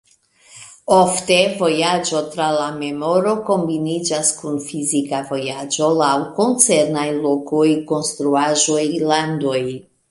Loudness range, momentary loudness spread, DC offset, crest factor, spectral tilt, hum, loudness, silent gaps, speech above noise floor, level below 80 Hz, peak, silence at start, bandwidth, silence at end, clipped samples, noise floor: 3 LU; 9 LU; under 0.1%; 18 dB; -3.5 dB/octave; none; -18 LUFS; none; 34 dB; -60 dBFS; 0 dBFS; 0.55 s; 11.5 kHz; 0.3 s; under 0.1%; -51 dBFS